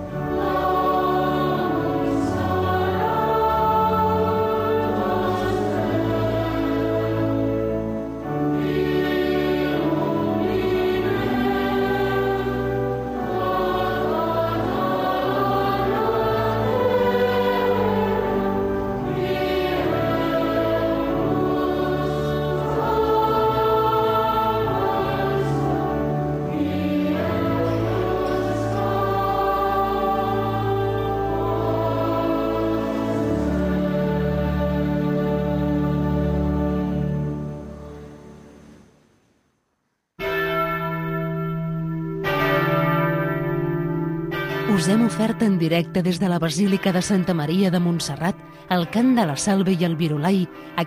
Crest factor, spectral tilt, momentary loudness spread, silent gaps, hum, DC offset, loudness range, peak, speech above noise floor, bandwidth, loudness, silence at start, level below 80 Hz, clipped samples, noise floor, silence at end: 14 dB; -6.5 dB/octave; 5 LU; none; none; under 0.1%; 3 LU; -6 dBFS; 53 dB; 15.5 kHz; -22 LUFS; 0 s; -40 dBFS; under 0.1%; -73 dBFS; 0 s